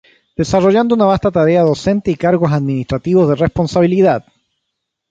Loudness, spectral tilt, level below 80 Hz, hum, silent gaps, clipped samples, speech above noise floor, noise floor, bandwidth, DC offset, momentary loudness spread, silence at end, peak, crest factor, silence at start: -14 LUFS; -7.5 dB/octave; -40 dBFS; none; none; under 0.1%; 62 dB; -75 dBFS; 7.8 kHz; under 0.1%; 7 LU; 0.9 s; 0 dBFS; 14 dB; 0.4 s